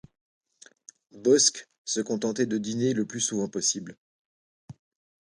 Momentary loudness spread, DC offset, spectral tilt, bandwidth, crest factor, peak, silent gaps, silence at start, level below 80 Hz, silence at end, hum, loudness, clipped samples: 11 LU; under 0.1%; -3 dB/octave; 11.5 kHz; 22 dB; -6 dBFS; 1.78-1.85 s, 3.98-4.68 s; 1.15 s; -70 dBFS; 0.5 s; none; -26 LUFS; under 0.1%